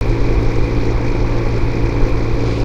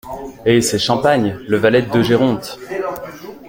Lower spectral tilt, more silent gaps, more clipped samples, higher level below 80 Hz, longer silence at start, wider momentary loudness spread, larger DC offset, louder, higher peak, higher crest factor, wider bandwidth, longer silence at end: first, -8 dB/octave vs -5 dB/octave; neither; neither; first, -18 dBFS vs -48 dBFS; about the same, 0 s vs 0.05 s; second, 1 LU vs 12 LU; first, 0.7% vs under 0.1%; about the same, -18 LUFS vs -16 LUFS; about the same, 0 dBFS vs -2 dBFS; about the same, 12 dB vs 16 dB; second, 7.4 kHz vs 17 kHz; about the same, 0 s vs 0 s